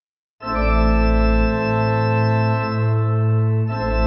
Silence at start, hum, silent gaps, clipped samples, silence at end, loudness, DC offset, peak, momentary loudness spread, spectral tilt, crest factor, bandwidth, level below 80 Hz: 0.4 s; none; none; under 0.1%; 0 s; -19 LUFS; under 0.1%; -6 dBFS; 4 LU; -9.5 dB/octave; 12 dB; 5.6 kHz; -24 dBFS